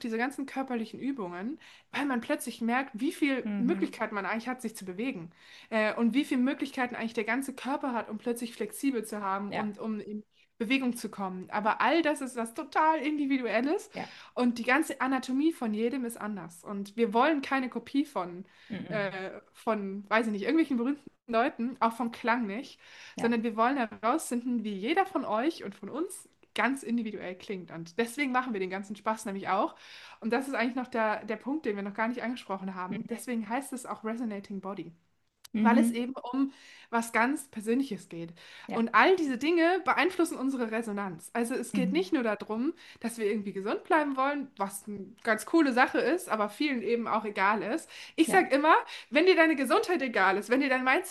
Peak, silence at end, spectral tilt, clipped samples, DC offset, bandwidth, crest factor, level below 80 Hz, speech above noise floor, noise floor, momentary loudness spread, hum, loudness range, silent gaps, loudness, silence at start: -6 dBFS; 0 s; -4.5 dB/octave; under 0.1%; under 0.1%; 12.5 kHz; 24 dB; -78 dBFS; 30 dB; -60 dBFS; 13 LU; none; 6 LU; none; -30 LUFS; 0 s